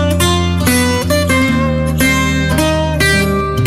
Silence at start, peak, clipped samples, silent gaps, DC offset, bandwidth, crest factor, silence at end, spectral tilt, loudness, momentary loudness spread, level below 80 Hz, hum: 0 s; -2 dBFS; under 0.1%; none; under 0.1%; 16 kHz; 10 dB; 0 s; -4.5 dB/octave; -13 LUFS; 2 LU; -24 dBFS; none